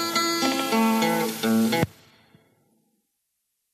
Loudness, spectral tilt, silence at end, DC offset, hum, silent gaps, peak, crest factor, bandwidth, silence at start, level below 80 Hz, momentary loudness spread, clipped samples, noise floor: -23 LUFS; -4 dB/octave; 1.85 s; under 0.1%; none; none; -6 dBFS; 20 dB; 15.5 kHz; 0 s; -62 dBFS; 4 LU; under 0.1%; -77 dBFS